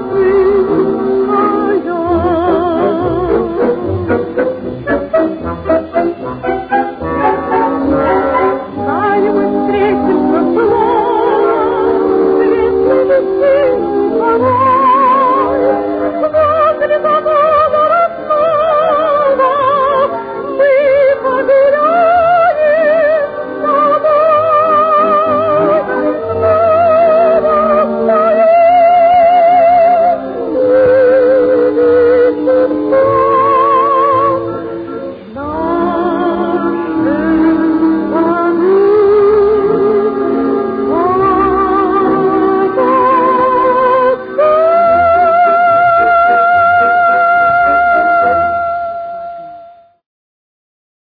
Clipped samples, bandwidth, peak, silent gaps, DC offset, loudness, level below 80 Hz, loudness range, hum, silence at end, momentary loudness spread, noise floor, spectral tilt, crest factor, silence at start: under 0.1%; 5 kHz; 0 dBFS; none; under 0.1%; -11 LUFS; -40 dBFS; 5 LU; none; 1.35 s; 7 LU; -37 dBFS; -10 dB/octave; 10 dB; 0 s